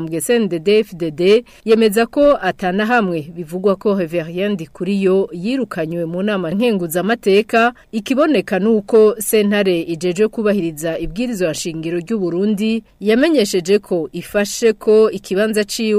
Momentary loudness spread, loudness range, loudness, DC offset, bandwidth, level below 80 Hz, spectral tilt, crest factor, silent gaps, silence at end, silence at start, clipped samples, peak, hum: 8 LU; 4 LU; -16 LUFS; under 0.1%; 15.5 kHz; -46 dBFS; -5 dB/octave; 12 dB; none; 0 s; 0 s; under 0.1%; -4 dBFS; none